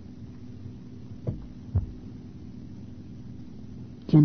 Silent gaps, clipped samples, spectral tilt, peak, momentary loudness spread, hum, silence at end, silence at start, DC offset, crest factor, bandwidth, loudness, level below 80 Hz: none; under 0.1%; -10.5 dB/octave; -8 dBFS; 12 LU; none; 0 s; 0 s; 0.4%; 22 dB; 6.2 kHz; -36 LUFS; -44 dBFS